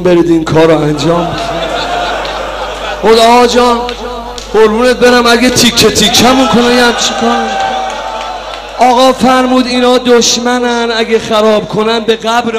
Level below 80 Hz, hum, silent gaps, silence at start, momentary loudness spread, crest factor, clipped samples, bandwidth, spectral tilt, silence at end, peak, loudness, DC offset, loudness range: -32 dBFS; none; none; 0 s; 12 LU; 8 dB; 0.5%; 16 kHz; -3.5 dB/octave; 0 s; 0 dBFS; -8 LUFS; under 0.1%; 3 LU